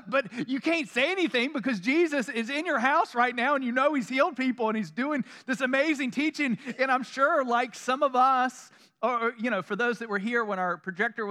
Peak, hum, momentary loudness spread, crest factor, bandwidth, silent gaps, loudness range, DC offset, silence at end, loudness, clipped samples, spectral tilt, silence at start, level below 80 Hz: -8 dBFS; none; 6 LU; 18 dB; 13 kHz; none; 2 LU; under 0.1%; 0 s; -27 LUFS; under 0.1%; -4.5 dB/octave; 0.05 s; under -90 dBFS